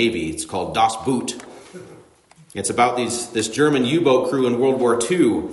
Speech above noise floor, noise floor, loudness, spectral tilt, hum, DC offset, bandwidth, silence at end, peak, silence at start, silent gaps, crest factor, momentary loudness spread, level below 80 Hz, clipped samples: 32 dB; -51 dBFS; -19 LUFS; -4.5 dB/octave; none; under 0.1%; 11.5 kHz; 0 s; -4 dBFS; 0 s; none; 16 dB; 14 LU; -56 dBFS; under 0.1%